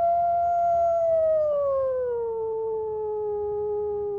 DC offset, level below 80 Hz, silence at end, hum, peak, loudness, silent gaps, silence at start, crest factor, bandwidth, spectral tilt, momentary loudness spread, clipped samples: under 0.1%; -56 dBFS; 0 s; none; -16 dBFS; -25 LUFS; none; 0 s; 8 dB; 7 kHz; -8 dB/octave; 7 LU; under 0.1%